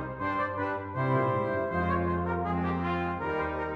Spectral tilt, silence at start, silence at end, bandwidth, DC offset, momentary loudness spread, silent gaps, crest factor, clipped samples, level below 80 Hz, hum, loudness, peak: -9 dB/octave; 0 s; 0 s; 6 kHz; under 0.1%; 4 LU; none; 14 dB; under 0.1%; -50 dBFS; none; -30 LUFS; -16 dBFS